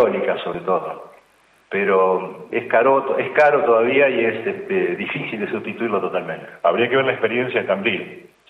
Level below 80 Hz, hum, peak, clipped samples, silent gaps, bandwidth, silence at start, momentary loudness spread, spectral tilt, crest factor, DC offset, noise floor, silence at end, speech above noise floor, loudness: -68 dBFS; none; -2 dBFS; under 0.1%; none; 6.2 kHz; 0 s; 10 LU; -7 dB/octave; 16 dB; under 0.1%; -56 dBFS; 0.25 s; 37 dB; -19 LUFS